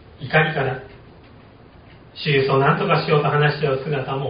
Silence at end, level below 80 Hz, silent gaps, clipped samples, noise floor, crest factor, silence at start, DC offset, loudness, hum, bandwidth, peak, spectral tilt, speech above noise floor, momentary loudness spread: 0 s; -52 dBFS; none; under 0.1%; -46 dBFS; 18 dB; 0.2 s; under 0.1%; -19 LUFS; none; 5.2 kHz; -2 dBFS; -4.5 dB/octave; 27 dB; 8 LU